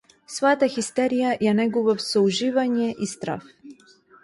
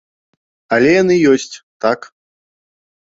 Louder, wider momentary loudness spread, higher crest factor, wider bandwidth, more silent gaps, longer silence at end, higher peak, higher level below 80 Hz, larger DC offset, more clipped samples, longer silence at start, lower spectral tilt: second, -22 LUFS vs -14 LUFS; about the same, 10 LU vs 11 LU; about the same, 16 dB vs 16 dB; first, 11.5 kHz vs 8 kHz; second, none vs 1.63-1.80 s; second, 0.5 s vs 1.05 s; second, -6 dBFS vs 0 dBFS; second, -66 dBFS vs -56 dBFS; neither; neither; second, 0.3 s vs 0.7 s; about the same, -4.5 dB/octave vs -5.5 dB/octave